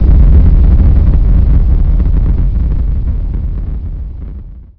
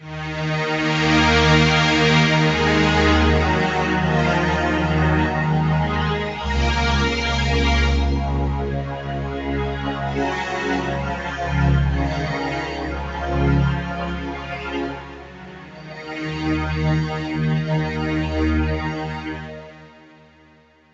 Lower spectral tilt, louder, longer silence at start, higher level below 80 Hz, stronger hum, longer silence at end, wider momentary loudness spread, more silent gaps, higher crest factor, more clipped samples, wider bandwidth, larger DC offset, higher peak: first, -12 dB/octave vs -6 dB/octave; first, -12 LUFS vs -20 LUFS; about the same, 0 s vs 0 s; first, -8 dBFS vs -28 dBFS; neither; second, 0.15 s vs 1.05 s; first, 16 LU vs 13 LU; neither; second, 8 dB vs 16 dB; first, 2% vs under 0.1%; second, 2.5 kHz vs 8 kHz; neither; first, 0 dBFS vs -4 dBFS